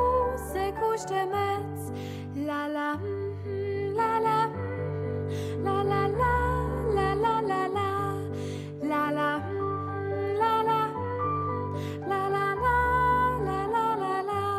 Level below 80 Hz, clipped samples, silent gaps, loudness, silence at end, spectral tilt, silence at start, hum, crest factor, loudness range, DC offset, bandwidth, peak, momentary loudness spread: -44 dBFS; under 0.1%; none; -28 LUFS; 0 s; -6.5 dB/octave; 0 s; none; 14 dB; 3 LU; under 0.1%; 15 kHz; -14 dBFS; 8 LU